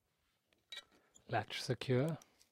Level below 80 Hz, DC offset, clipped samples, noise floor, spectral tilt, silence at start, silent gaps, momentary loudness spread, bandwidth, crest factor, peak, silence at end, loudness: -76 dBFS; under 0.1%; under 0.1%; -82 dBFS; -5.5 dB/octave; 0.7 s; none; 16 LU; 16 kHz; 20 dB; -22 dBFS; 0.3 s; -39 LUFS